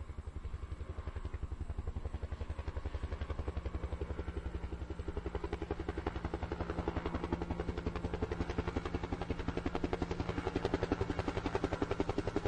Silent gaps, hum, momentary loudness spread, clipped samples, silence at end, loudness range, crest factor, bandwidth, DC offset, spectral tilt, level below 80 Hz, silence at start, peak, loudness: none; none; 8 LU; under 0.1%; 0 s; 5 LU; 20 dB; 9.4 kHz; under 0.1%; -7.5 dB/octave; -44 dBFS; 0 s; -18 dBFS; -40 LUFS